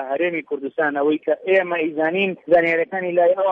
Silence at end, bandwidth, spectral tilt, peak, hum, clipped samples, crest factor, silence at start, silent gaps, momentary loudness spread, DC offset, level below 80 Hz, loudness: 0 s; 5 kHz; -7.5 dB/octave; -4 dBFS; none; under 0.1%; 14 dB; 0 s; none; 6 LU; under 0.1%; -64 dBFS; -20 LUFS